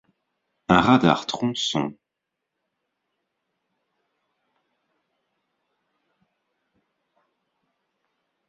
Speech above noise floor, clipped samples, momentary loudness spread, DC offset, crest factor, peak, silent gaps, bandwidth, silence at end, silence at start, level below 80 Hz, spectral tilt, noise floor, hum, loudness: 63 dB; under 0.1%; 13 LU; under 0.1%; 26 dB; -2 dBFS; none; 7.8 kHz; 6.55 s; 0.7 s; -56 dBFS; -5 dB/octave; -83 dBFS; none; -21 LUFS